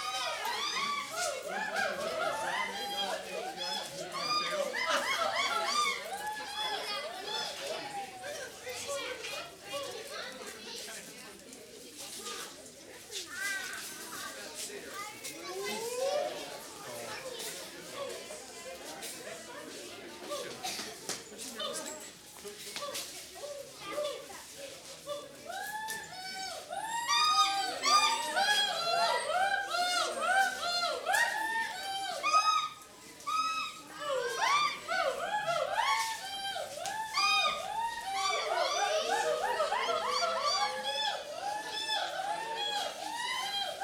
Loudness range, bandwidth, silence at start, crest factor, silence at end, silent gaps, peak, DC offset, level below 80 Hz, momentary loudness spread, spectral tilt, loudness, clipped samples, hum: 12 LU; over 20 kHz; 0 s; 20 dB; 0 s; none; -14 dBFS; under 0.1%; -72 dBFS; 15 LU; 0 dB/octave; -33 LUFS; under 0.1%; none